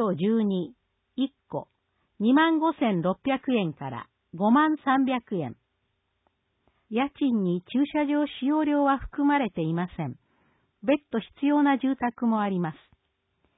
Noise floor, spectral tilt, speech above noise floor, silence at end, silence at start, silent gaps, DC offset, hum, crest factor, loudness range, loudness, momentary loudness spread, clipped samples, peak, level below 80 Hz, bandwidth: -76 dBFS; -11 dB/octave; 51 dB; 0.85 s; 0 s; none; under 0.1%; none; 16 dB; 3 LU; -26 LUFS; 14 LU; under 0.1%; -10 dBFS; -58 dBFS; 4 kHz